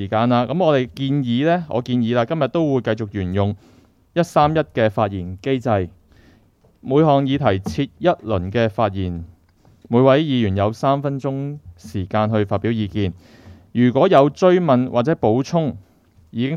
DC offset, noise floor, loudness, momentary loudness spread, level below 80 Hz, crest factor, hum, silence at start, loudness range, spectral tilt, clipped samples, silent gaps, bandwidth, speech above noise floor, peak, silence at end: under 0.1%; -55 dBFS; -19 LUFS; 12 LU; -50 dBFS; 18 dB; none; 0 s; 4 LU; -7.5 dB/octave; under 0.1%; none; 12 kHz; 37 dB; 0 dBFS; 0 s